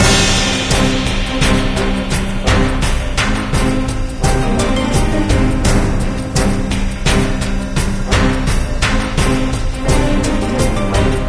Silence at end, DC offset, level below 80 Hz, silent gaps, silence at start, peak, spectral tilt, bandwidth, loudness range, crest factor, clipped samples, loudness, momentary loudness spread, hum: 0 s; under 0.1%; -18 dBFS; none; 0 s; 0 dBFS; -4.5 dB/octave; 11 kHz; 1 LU; 14 dB; under 0.1%; -16 LUFS; 5 LU; none